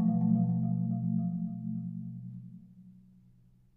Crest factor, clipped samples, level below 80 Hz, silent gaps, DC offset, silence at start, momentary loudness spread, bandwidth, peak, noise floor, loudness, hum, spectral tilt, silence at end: 16 dB; under 0.1%; -68 dBFS; none; under 0.1%; 0 s; 19 LU; 1.3 kHz; -16 dBFS; -62 dBFS; -32 LUFS; none; -14.5 dB/octave; 0.8 s